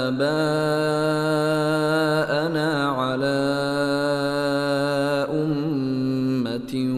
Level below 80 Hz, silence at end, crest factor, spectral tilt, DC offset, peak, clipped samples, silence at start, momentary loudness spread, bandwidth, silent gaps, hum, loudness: -56 dBFS; 0 s; 12 dB; -6 dB/octave; under 0.1%; -10 dBFS; under 0.1%; 0 s; 3 LU; 14.5 kHz; none; none; -22 LUFS